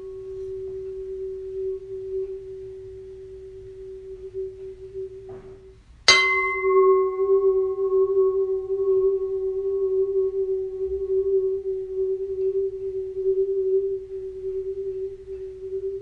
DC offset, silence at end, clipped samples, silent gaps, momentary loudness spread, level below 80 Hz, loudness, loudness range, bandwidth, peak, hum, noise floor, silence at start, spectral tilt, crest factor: under 0.1%; 0 s; under 0.1%; none; 19 LU; -52 dBFS; -24 LUFS; 15 LU; 9.8 kHz; 0 dBFS; none; -48 dBFS; 0 s; -3 dB/octave; 24 dB